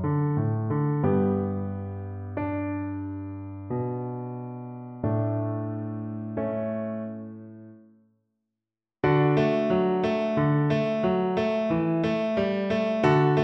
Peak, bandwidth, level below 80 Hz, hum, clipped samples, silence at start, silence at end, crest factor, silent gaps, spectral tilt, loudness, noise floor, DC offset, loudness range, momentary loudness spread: -8 dBFS; 6.2 kHz; -58 dBFS; none; under 0.1%; 0 s; 0 s; 18 dB; none; -9 dB/octave; -27 LUFS; -89 dBFS; under 0.1%; 9 LU; 13 LU